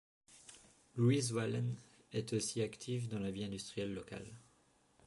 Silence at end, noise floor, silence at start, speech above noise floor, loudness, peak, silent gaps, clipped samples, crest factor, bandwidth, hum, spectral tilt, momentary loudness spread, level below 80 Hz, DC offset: 0.65 s; -72 dBFS; 0.3 s; 34 dB; -39 LUFS; -22 dBFS; none; under 0.1%; 18 dB; 11.5 kHz; none; -5.5 dB/octave; 22 LU; -70 dBFS; under 0.1%